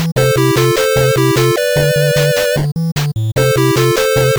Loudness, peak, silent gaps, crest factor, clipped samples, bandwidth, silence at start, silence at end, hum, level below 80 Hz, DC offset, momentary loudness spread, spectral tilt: -13 LUFS; -2 dBFS; 2.92-2.96 s; 10 dB; under 0.1%; over 20 kHz; 0 s; 0 s; none; -38 dBFS; 0.2%; 5 LU; -5 dB/octave